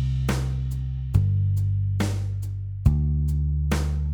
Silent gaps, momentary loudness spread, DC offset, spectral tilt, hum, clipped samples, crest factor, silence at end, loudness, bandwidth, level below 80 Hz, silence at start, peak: none; 7 LU; under 0.1%; -7 dB/octave; none; under 0.1%; 16 dB; 0 s; -25 LUFS; 16.5 kHz; -28 dBFS; 0 s; -6 dBFS